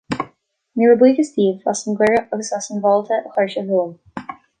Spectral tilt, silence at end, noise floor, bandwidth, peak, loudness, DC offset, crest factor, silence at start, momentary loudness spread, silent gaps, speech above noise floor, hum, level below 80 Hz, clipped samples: -5 dB/octave; 0.25 s; -55 dBFS; 10.5 kHz; -2 dBFS; -18 LUFS; under 0.1%; 16 dB; 0.1 s; 18 LU; none; 38 dB; none; -60 dBFS; under 0.1%